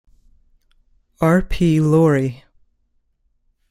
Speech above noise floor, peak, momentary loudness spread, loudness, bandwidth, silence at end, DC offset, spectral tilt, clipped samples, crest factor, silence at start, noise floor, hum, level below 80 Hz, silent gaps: 49 dB; -4 dBFS; 7 LU; -17 LUFS; 14.5 kHz; 1.35 s; under 0.1%; -8 dB/octave; under 0.1%; 16 dB; 1.2 s; -65 dBFS; none; -36 dBFS; none